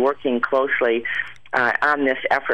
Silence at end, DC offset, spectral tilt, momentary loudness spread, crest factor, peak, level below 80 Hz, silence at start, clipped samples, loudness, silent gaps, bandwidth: 0 s; 0.7%; -5.5 dB/octave; 6 LU; 14 dB; -6 dBFS; -60 dBFS; 0 s; under 0.1%; -20 LUFS; none; 10 kHz